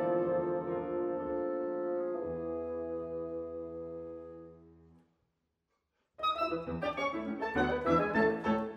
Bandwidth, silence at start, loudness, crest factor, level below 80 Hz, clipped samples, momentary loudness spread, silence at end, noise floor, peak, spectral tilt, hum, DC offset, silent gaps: 8 kHz; 0 s; -34 LUFS; 20 dB; -60 dBFS; under 0.1%; 13 LU; 0 s; -82 dBFS; -16 dBFS; -7 dB/octave; none; under 0.1%; none